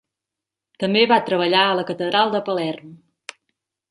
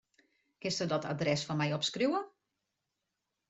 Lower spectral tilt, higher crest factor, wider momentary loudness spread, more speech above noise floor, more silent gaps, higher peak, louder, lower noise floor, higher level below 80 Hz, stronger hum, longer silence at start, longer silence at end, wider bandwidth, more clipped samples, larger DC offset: about the same, -5.5 dB/octave vs -4.5 dB/octave; about the same, 20 dB vs 18 dB; first, 23 LU vs 6 LU; first, 67 dB vs 53 dB; neither; first, -2 dBFS vs -18 dBFS; first, -19 LUFS vs -33 LUFS; about the same, -86 dBFS vs -86 dBFS; about the same, -70 dBFS vs -72 dBFS; neither; first, 0.8 s vs 0.65 s; second, 0.95 s vs 1.2 s; first, 11.5 kHz vs 8.2 kHz; neither; neither